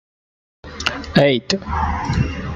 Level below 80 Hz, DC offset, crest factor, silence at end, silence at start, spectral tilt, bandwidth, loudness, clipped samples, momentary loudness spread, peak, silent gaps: -32 dBFS; under 0.1%; 20 dB; 0 s; 0.65 s; -5.5 dB/octave; 11.5 kHz; -19 LUFS; under 0.1%; 8 LU; -2 dBFS; none